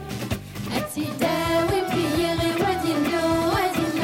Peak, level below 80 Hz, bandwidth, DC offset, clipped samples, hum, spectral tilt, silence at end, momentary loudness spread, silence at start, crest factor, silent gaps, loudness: -10 dBFS; -44 dBFS; 17 kHz; under 0.1%; under 0.1%; none; -5 dB/octave; 0 s; 8 LU; 0 s; 12 dB; none; -23 LUFS